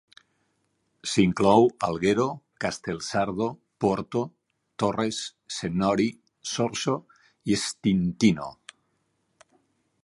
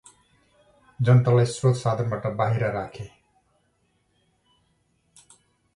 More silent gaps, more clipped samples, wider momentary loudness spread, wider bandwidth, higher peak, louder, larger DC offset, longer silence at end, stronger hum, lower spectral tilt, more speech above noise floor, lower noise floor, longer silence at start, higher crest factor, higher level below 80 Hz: neither; neither; second, 12 LU vs 17 LU; about the same, 11.5 kHz vs 11 kHz; about the same, -4 dBFS vs -6 dBFS; second, -26 LUFS vs -23 LUFS; neither; second, 1.5 s vs 2.7 s; neither; second, -5 dB/octave vs -7 dB/octave; about the same, 48 dB vs 47 dB; first, -73 dBFS vs -69 dBFS; about the same, 1.05 s vs 1 s; about the same, 22 dB vs 20 dB; about the same, -56 dBFS vs -58 dBFS